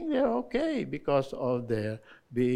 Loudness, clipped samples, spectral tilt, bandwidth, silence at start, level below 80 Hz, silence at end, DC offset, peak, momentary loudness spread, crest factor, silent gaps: -30 LUFS; under 0.1%; -7.5 dB/octave; 12 kHz; 0 s; -56 dBFS; 0 s; under 0.1%; -14 dBFS; 9 LU; 16 dB; none